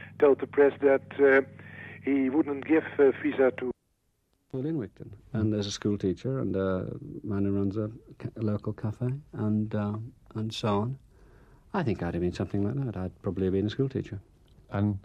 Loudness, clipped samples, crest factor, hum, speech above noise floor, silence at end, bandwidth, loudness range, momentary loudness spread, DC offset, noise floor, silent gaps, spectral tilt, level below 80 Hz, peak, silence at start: -28 LUFS; under 0.1%; 18 dB; none; 46 dB; 0.05 s; 9 kHz; 7 LU; 16 LU; under 0.1%; -74 dBFS; none; -7.5 dB/octave; -58 dBFS; -10 dBFS; 0 s